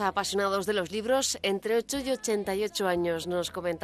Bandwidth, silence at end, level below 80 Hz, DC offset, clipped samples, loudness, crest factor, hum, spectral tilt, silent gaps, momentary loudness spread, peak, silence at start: 15 kHz; 0 s; -58 dBFS; under 0.1%; under 0.1%; -29 LUFS; 16 dB; none; -3 dB/octave; none; 4 LU; -14 dBFS; 0 s